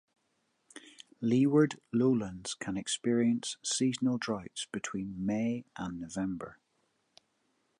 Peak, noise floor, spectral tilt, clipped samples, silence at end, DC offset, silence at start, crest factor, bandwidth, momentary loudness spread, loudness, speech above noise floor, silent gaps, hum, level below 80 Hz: -14 dBFS; -77 dBFS; -5 dB/octave; under 0.1%; 1.25 s; under 0.1%; 0.75 s; 20 dB; 11.5 kHz; 12 LU; -32 LUFS; 46 dB; none; none; -66 dBFS